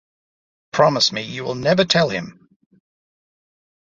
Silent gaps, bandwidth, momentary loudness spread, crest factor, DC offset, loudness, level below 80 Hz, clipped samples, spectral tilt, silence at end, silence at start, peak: none; 7.8 kHz; 12 LU; 20 dB; under 0.1%; -18 LUFS; -58 dBFS; under 0.1%; -4 dB/octave; 1.65 s; 0.75 s; -2 dBFS